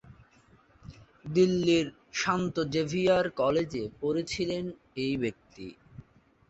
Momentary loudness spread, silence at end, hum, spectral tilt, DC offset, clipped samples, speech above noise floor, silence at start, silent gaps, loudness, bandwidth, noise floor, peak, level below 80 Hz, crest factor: 15 LU; 0.8 s; none; -5.5 dB/octave; under 0.1%; under 0.1%; 33 dB; 0.05 s; none; -29 LUFS; 8.2 kHz; -61 dBFS; -12 dBFS; -58 dBFS; 18 dB